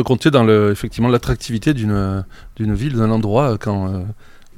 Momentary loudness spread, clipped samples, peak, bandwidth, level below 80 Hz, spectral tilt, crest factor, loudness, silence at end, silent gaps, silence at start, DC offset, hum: 12 LU; under 0.1%; 0 dBFS; 15.5 kHz; -34 dBFS; -7 dB/octave; 16 dB; -17 LUFS; 0.25 s; none; 0 s; under 0.1%; none